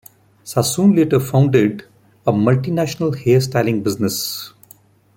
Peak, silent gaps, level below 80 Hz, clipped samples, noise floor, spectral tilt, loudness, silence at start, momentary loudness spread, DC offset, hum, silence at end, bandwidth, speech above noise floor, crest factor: -2 dBFS; none; -54 dBFS; under 0.1%; -49 dBFS; -6 dB/octave; -17 LUFS; 0.45 s; 10 LU; under 0.1%; none; 0.7 s; 17 kHz; 33 dB; 16 dB